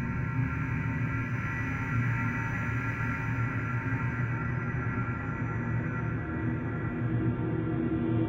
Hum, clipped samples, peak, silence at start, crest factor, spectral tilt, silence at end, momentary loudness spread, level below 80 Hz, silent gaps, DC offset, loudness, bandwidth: none; under 0.1%; -16 dBFS; 0 s; 14 dB; -9 dB/octave; 0 s; 3 LU; -44 dBFS; none; under 0.1%; -31 LUFS; 6.6 kHz